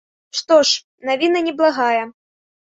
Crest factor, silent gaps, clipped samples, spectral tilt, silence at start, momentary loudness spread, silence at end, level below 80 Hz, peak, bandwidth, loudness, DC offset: 16 dB; 0.84-0.98 s; under 0.1%; -1 dB/octave; 0.35 s; 13 LU; 0.6 s; -68 dBFS; -2 dBFS; 8 kHz; -17 LUFS; under 0.1%